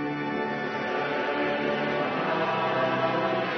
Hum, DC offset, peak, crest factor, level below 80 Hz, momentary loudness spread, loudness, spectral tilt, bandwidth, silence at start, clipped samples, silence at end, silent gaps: none; under 0.1%; -12 dBFS; 14 dB; -68 dBFS; 4 LU; -27 LUFS; -6.5 dB/octave; 6.4 kHz; 0 s; under 0.1%; 0 s; none